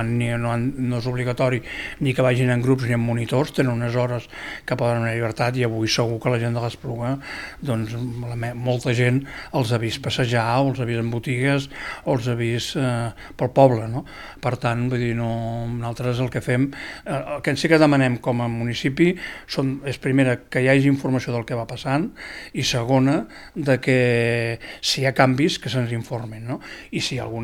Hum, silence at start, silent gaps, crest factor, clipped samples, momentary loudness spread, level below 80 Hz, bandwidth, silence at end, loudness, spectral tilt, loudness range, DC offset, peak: none; 0 s; none; 20 dB; under 0.1%; 11 LU; -48 dBFS; 14.5 kHz; 0 s; -22 LUFS; -6 dB/octave; 4 LU; under 0.1%; -2 dBFS